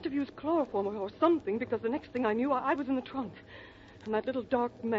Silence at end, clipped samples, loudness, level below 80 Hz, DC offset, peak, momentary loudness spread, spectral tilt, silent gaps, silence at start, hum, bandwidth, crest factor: 0 s; under 0.1%; -32 LUFS; -64 dBFS; under 0.1%; -14 dBFS; 16 LU; -4.5 dB/octave; none; 0 s; none; 7 kHz; 18 dB